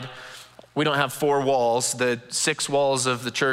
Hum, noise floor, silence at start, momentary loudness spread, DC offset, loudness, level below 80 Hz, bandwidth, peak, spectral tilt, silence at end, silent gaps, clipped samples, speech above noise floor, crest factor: none; -45 dBFS; 0 s; 16 LU; under 0.1%; -23 LUFS; -68 dBFS; 16 kHz; -6 dBFS; -3 dB/octave; 0 s; none; under 0.1%; 22 dB; 18 dB